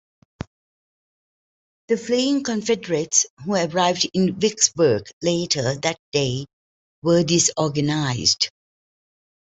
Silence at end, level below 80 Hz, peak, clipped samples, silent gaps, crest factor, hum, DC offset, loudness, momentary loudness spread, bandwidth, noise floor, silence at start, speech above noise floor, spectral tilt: 1.05 s; -58 dBFS; -2 dBFS; under 0.1%; 3.30-3.37 s, 5.13-5.21 s, 5.99-6.12 s, 6.53-7.02 s; 20 dB; none; under 0.1%; -20 LUFS; 8 LU; 8.2 kHz; under -90 dBFS; 1.9 s; over 69 dB; -3.5 dB/octave